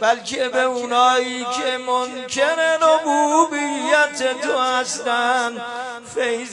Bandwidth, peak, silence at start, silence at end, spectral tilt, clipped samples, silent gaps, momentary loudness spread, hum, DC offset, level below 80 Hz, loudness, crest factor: 11 kHz; -2 dBFS; 0 s; 0 s; -1 dB/octave; under 0.1%; none; 8 LU; none; under 0.1%; -70 dBFS; -19 LUFS; 18 dB